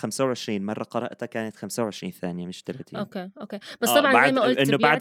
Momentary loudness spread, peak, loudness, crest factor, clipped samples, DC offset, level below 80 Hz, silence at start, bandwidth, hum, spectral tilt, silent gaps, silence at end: 18 LU; -4 dBFS; -24 LUFS; 20 dB; under 0.1%; under 0.1%; -74 dBFS; 0 s; 17.5 kHz; none; -4 dB/octave; none; 0 s